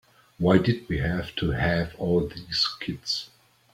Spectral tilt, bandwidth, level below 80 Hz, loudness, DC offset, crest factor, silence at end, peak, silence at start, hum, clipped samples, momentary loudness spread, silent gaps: -6 dB/octave; 15 kHz; -44 dBFS; -26 LUFS; under 0.1%; 22 dB; 0.45 s; -4 dBFS; 0.4 s; none; under 0.1%; 8 LU; none